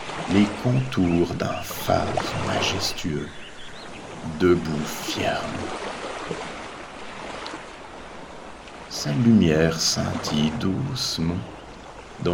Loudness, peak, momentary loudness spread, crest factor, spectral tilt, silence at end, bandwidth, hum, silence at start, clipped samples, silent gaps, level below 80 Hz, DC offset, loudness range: -24 LUFS; -6 dBFS; 19 LU; 18 dB; -5 dB/octave; 0 s; 18 kHz; none; 0 s; under 0.1%; none; -48 dBFS; under 0.1%; 10 LU